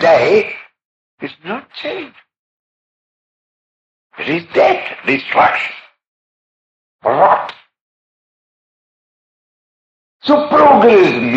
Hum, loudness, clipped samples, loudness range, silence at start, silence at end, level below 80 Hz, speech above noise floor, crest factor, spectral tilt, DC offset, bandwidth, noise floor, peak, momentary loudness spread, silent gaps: none; -12 LUFS; under 0.1%; 13 LU; 0 s; 0 s; -60 dBFS; over 78 dB; 16 dB; -6 dB/octave; under 0.1%; 8 kHz; under -90 dBFS; 0 dBFS; 20 LU; 0.85-1.18 s, 2.39-4.10 s, 6.07-6.99 s, 7.81-10.20 s